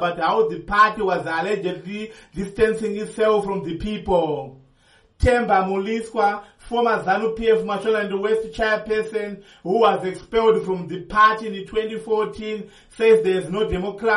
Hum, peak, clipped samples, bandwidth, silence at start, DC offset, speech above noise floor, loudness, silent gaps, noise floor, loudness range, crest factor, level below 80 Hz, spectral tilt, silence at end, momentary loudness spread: none; -4 dBFS; under 0.1%; 11.5 kHz; 0 s; under 0.1%; 36 dB; -21 LUFS; none; -56 dBFS; 3 LU; 16 dB; -40 dBFS; -6 dB/octave; 0 s; 13 LU